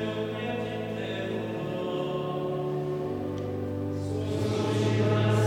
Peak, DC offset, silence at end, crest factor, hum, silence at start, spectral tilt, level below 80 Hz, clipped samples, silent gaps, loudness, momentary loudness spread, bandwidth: -12 dBFS; under 0.1%; 0 s; 16 dB; none; 0 s; -7 dB/octave; -58 dBFS; under 0.1%; none; -30 LUFS; 7 LU; 12.5 kHz